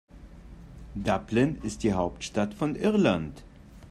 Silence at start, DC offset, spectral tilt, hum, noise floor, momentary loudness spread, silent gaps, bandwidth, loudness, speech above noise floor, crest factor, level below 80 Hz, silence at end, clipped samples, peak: 0.15 s; under 0.1%; -6 dB/octave; none; -47 dBFS; 16 LU; none; 12 kHz; -28 LUFS; 20 dB; 18 dB; -48 dBFS; 0 s; under 0.1%; -10 dBFS